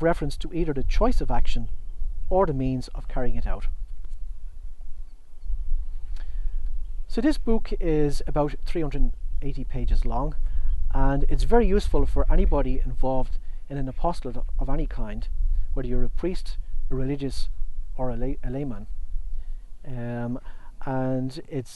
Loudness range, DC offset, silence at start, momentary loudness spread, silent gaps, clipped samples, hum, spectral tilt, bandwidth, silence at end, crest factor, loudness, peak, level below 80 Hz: 8 LU; under 0.1%; 0 s; 15 LU; none; under 0.1%; none; -7.5 dB/octave; 6.2 kHz; 0 s; 18 dB; -29 LUFS; -4 dBFS; -28 dBFS